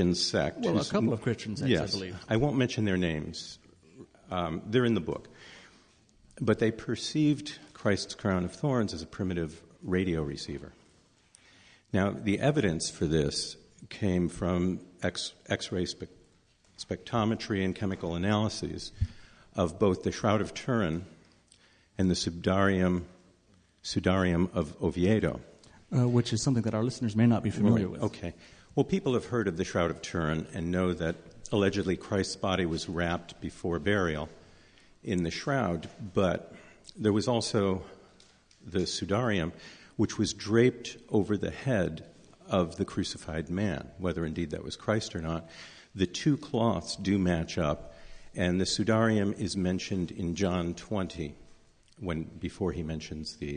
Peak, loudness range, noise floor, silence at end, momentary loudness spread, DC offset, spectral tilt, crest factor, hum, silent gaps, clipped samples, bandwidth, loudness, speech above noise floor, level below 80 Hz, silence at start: -10 dBFS; 4 LU; -64 dBFS; 0 s; 12 LU; under 0.1%; -5.5 dB/octave; 20 dB; none; none; under 0.1%; 10 kHz; -30 LUFS; 35 dB; -48 dBFS; 0 s